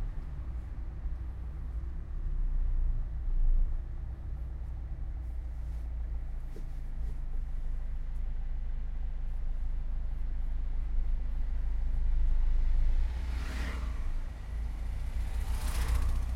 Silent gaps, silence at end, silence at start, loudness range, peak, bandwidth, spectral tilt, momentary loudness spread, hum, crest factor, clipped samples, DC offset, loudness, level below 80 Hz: none; 0 s; 0 s; 5 LU; -18 dBFS; 11.5 kHz; -6 dB/octave; 8 LU; none; 12 dB; under 0.1%; under 0.1%; -38 LUFS; -32 dBFS